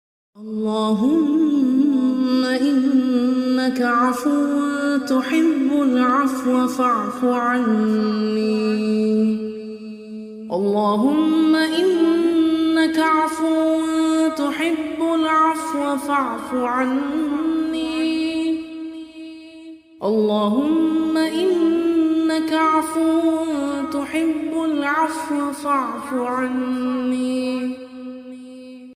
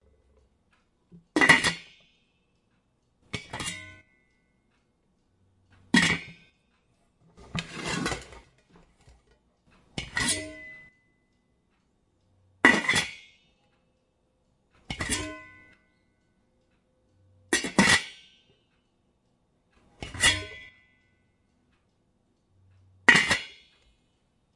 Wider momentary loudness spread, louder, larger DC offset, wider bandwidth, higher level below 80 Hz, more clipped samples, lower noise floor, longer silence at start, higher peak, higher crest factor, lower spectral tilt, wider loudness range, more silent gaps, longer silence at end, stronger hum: second, 11 LU vs 24 LU; first, -19 LUFS vs -24 LUFS; neither; first, 15 kHz vs 11.5 kHz; second, -62 dBFS vs -56 dBFS; neither; second, -40 dBFS vs -71 dBFS; second, 0.35 s vs 1.35 s; second, -6 dBFS vs 0 dBFS; second, 12 dB vs 30 dB; first, -5 dB/octave vs -2.5 dB/octave; second, 5 LU vs 11 LU; neither; second, 0 s vs 1.05 s; neither